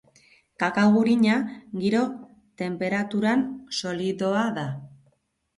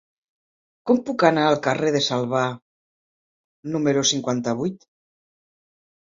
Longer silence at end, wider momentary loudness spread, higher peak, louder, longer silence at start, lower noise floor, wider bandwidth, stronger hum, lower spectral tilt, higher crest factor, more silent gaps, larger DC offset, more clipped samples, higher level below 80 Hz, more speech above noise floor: second, 0.7 s vs 1.35 s; about the same, 13 LU vs 11 LU; second, -8 dBFS vs 0 dBFS; second, -24 LUFS vs -21 LUFS; second, 0.6 s vs 0.85 s; second, -68 dBFS vs under -90 dBFS; first, 11.5 kHz vs 7.6 kHz; neither; first, -6 dB/octave vs -4 dB/octave; second, 16 dB vs 24 dB; second, none vs 2.62-3.63 s; neither; neither; about the same, -66 dBFS vs -66 dBFS; second, 45 dB vs over 69 dB